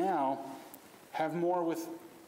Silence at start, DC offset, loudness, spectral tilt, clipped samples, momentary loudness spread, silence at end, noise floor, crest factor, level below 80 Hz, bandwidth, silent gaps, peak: 0 s; under 0.1%; -35 LUFS; -6 dB/octave; under 0.1%; 17 LU; 0 s; -54 dBFS; 14 dB; -86 dBFS; 16 kHz; none; -20 dBFS